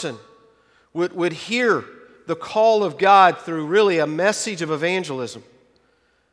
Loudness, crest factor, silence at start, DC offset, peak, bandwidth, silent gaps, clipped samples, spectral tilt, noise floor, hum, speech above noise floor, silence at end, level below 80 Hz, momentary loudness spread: -19 LUFS; 20 dB; 0 s; under 0.1%; 0 dBFS; 11 kHz; none; under 0.1%; -4 dB/octave; -63 dBFS; none; 43 dB; 0.9 s; -70 dBFS; 16 LU